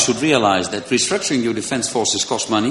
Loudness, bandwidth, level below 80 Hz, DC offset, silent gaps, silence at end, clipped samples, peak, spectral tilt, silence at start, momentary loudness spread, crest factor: -18 LUFS; 11.5 kHz; -54 dBFS; under 0.1%; none; 0 s; under 0.1%; 0 dBFS; -3 dB/octave; 0 s; 5 LU; 18 dB